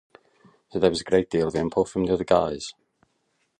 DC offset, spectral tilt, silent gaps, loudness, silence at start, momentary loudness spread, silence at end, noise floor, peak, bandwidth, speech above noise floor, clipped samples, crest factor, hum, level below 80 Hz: under 0.1%; -5.5 dB/octave; none; -24 LUFS; 0.75 s; 12 LU; 0.9 s; -72 dBFS; -6 dBFS; 11 kHz; 49 dB; under 0.1%; 20 dB; none; -50 dBFS